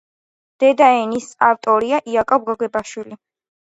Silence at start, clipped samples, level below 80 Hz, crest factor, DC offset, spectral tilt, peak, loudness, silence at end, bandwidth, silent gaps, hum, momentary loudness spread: 0.6 s; under 0.1%; -58 dBFS; 18 dB; under 0.1%; -4 dB/octave; 0 dBFS; -17 LUFS; 0.5 s; 8.2 kHz; none; none; 14 LU